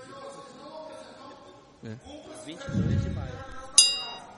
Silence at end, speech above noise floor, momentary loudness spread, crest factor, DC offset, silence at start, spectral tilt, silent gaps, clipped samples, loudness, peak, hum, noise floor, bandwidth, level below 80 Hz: 0 s; 19 dB; 27 LU; 30 dB; under 0.1%; 0 s; -2.5 dB/octave; none; under 0.1%; -23 LUFS; -2 dBFS; none; -51 dBFS; 11.5 kHz; -48 dBFS